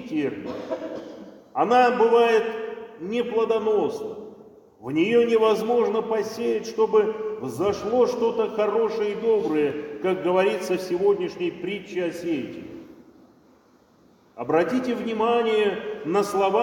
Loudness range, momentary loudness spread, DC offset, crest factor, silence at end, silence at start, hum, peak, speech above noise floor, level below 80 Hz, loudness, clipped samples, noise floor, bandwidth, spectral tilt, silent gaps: 6 LU; 15 LU; under 0.1%; 18 dB; 0 s; 0 s; none; -6 dBFS; 35 dB; -64 dBFS; -23 LUFS; under 0.1%; -57 dBFS; 17 kHz; -5.5 dB/octave; none